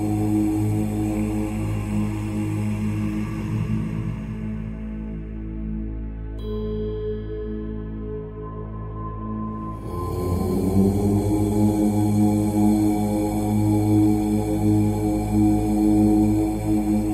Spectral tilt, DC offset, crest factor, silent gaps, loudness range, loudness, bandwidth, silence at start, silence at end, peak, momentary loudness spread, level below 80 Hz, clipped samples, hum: -8 dB/octave; under 0.1%; 16 dB; none; 10 LU; -23 LUFS; 15 kHz; 0 s; 0 s; -6 dBFS; 13 LU; -34 dBFS; under 0.1%; none